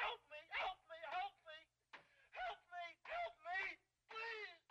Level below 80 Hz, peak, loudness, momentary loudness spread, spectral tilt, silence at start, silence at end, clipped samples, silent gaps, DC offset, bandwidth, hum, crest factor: -80 dBFS; -32 dBFS; -48 LUFS; 15 LU; -1.5 dB/octave; 0 s; 0.1 s; under 0.1%; none; under 0.1%; 11 kHz; none; 18 dB